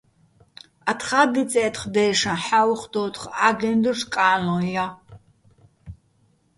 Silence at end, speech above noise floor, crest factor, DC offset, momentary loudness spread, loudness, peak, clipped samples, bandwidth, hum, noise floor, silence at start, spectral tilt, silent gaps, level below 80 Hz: 0.65 s; 41 dB; 20 dB; under 0.1%; 8 LU; -21 LUFS; -2 dBFS; under 0.1%; 11.5 kHz; none; -63 dBFS; 0.85 s; -4 dB/octave; none; -56 dBFS